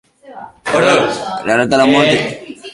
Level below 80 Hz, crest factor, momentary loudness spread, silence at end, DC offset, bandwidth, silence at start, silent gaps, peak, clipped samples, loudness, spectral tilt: -50 dBFS; 14 dB; 13 LU; 0 s; under 0.1%; 11.5 kHz; 0.25 s; none; 0 dBFS; under 0.1%; -13 LUFS; -4.5 dB/octave